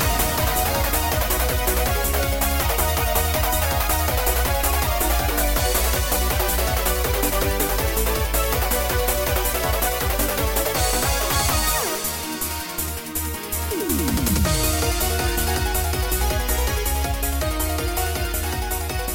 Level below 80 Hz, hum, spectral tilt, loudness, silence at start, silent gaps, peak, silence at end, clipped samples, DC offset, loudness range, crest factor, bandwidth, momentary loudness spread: -26 dBFS; none; -3.5 dB/octave; -21 LUFS; 0 s; none; -6 dBFS; 0 s; under 0.1%; under 0.1%; 2 LU; 16 dB; 17 kHz; 5 LU